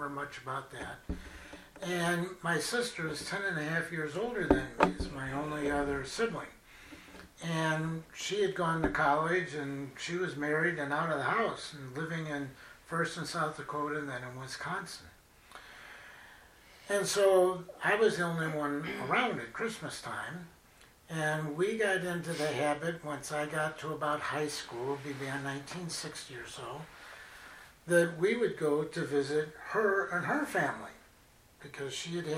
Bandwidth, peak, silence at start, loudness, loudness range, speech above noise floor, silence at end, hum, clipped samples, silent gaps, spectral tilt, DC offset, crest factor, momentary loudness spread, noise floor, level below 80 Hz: 16 kHz; -8 dBFS; 0 s; -33 LUFS; 6 LU; 28 dB; 0 s; none; under 0.1%; none; -4.5 dB/octave; under 0.1%; 26 dB; 19 LU; -62 dBFS; -56 dBFS